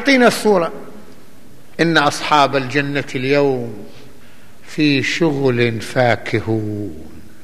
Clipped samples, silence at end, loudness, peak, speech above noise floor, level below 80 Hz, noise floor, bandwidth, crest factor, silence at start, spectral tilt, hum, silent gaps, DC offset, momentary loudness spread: under 0.1%; 0.25 s; -16 LUFS; 0 dBFS; 29 dB; -52 dBFS; -45 dBFS; 15 kHz; 18 dB; 0 s; -5 dB/octave; none; none; 3%; 17 LU